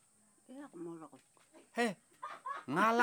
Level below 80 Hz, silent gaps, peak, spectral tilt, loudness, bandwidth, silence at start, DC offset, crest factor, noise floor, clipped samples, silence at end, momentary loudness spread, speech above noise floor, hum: under -90 dBFS; none; -16 dBFS; -4.5 dB/octave; -39 LUFS; over 20 kHz; 0.5 s; under 0.1%; 24 dB; -68 dBFS; under 0.1%; 0 s; 21 LU; 32 dB; none